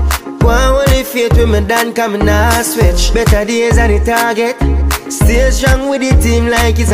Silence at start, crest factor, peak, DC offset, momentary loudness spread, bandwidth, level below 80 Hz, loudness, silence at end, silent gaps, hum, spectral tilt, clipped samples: 0 s; 10 dB; 0 dBFS; under 0.1%; 3 LU; 16 kHz; -14 dBFS; -11 LUFS; 0 s; none; none; -5 dB/octave; under 0.1%